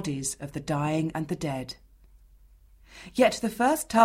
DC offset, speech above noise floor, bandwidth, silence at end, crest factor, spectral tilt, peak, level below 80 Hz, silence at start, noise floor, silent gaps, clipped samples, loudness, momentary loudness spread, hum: under 0.1%; 29 dB; 16 kHz; 0 s; 22 dB; -5 dB/octave; -6 dBFS; -54 dBFS; 0 s; -56 dBFS; none; under 0.1%; -28 LUFS; 14 LU; none